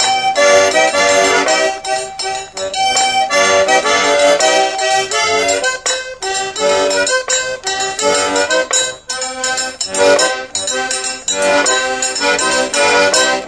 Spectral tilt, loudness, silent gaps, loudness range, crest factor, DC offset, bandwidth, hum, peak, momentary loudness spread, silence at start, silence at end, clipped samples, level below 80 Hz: -0.5 dB/octave; -13 LUFS; none; 3 LU; 14 dB; under 0.1%; 11 kHz; none; 0 dBFS; 8 LU; 0 s; 0 s; under 0.1%; -50 dBFS